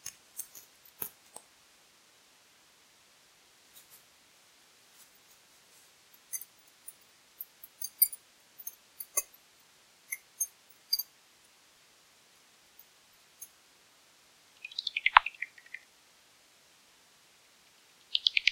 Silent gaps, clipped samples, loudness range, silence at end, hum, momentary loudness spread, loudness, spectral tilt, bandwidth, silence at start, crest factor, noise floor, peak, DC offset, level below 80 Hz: none; under 0.1%; 17 LU; 0 s; none; 28 LU; -32 LUFS; 3 dB/octave; 16.5 kHz; 0.05 s; 36 dB; -63 dBFS; -2 dBFS; under 0.1%; -72 dBFS